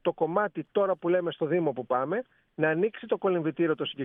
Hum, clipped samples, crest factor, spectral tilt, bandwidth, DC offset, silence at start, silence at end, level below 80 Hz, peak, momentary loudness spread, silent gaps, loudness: none; under 0.1%; 16 dB; -10 dB/octave; 3.8 kHz; under 0.1%; 0.05 s; 0 s; -76 dBFS; -12 dBFS; 3 LU; none; -28 LUFS